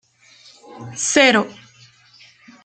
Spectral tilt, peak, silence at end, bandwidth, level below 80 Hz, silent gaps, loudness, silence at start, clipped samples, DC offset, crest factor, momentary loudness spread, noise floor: -2 dB/octave; -2 dBFS; 1.1 s; 10 kHz; -66 dBFS; none; -15 LUFS; 0.75 s; under 0.1%; under 0.1%; 20 dB; 21 LU; -50 dBFS